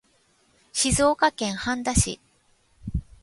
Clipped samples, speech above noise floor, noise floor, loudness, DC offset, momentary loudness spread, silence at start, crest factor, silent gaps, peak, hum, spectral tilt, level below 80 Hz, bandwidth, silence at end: under 0.1%; 41 dB; -64 dBFS; -24 LUFS; under 0.1%; 14 LU; 0.75 s; 20 dB; none; -6 dBFS; none; -3.5 dB/octave; -38 dBFS; 12 kHz; 0.2 s